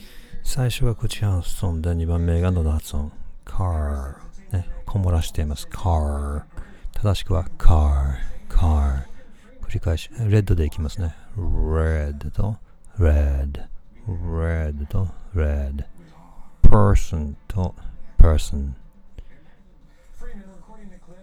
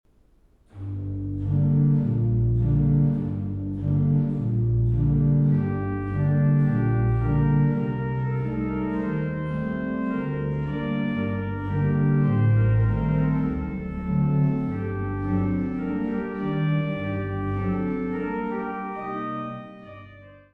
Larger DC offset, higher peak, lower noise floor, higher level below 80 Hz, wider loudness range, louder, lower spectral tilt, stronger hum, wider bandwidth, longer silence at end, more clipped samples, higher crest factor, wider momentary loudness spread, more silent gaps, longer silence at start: neither; first, 0 dBFS vs -10 dBFS; second, -48 dBFS vs -58 dBFS; first, -24 dBFS vs -38 dBFS; about the same, 4 LU vs 5 LU; about the same, -24 LUFS vs -24 LUFS; second, -7 dB/octave vs -11.5 dB/octave; neither; first, 13 kHz vs 3.7 kHz; about the same, 0.05 s vs 0.15 s; neither; first, 20 dB vs 14 dB; first, 17 LU vs 10 LU; neither; second, 0.15 s vs 0.75 s